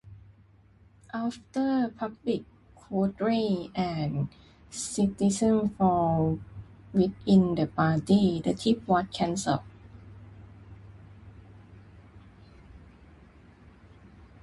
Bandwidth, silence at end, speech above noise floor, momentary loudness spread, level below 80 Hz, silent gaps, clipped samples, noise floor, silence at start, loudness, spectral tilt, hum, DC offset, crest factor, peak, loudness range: 11.5 kHz; 1.65 s; 32 dB; 13 LU; -54 dBFS; none; under 0.1%; -58 dBFS; 0.05 s; -27 LUFS; -6.5 dB/octave; none; under 0.1%; 20 dB; -10 dBFS; 7 LU